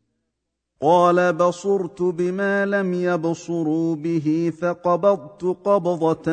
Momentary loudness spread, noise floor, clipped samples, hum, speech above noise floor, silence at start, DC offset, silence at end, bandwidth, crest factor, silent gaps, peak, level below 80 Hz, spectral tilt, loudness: 7 LU; -78 dBFS; under 0.1%; none; 58 dB; 0.8 s; under 0.1%; 0 s; 9.2 kHz; 16 dB; none; -4 dBFS; -64 dBFS; -7 dB/octave; -21 LUFS